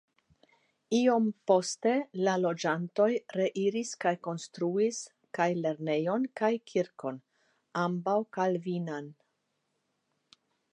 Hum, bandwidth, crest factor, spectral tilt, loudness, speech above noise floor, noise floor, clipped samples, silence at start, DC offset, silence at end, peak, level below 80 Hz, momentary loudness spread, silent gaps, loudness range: none; 11 kHz; 20 dB; -5.5 dB/octave; -30 LUFS; 50 dB; -79 dBFS; under 0.1%; 0.9 s; under 0.1%; 1.6 s; -12 dBFS; -86 dBFS; 12 LU; none; 6 LU